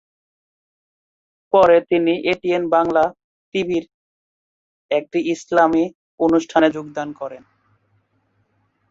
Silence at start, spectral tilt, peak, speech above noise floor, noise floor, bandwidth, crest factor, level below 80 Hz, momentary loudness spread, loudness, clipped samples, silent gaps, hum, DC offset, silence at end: 1.55 s; -5.5 dB/octave; -2 dBFS; 48 dB; -65 dBFS; 7.8 kHz; 18 dB; -58 dBFS; 13 LU; -18 LUFS; under 0.1%; 3.24-3.52 s, 3.94-4.89 s, 5.95-6.18 s; none; under 0.1%; 1.5 s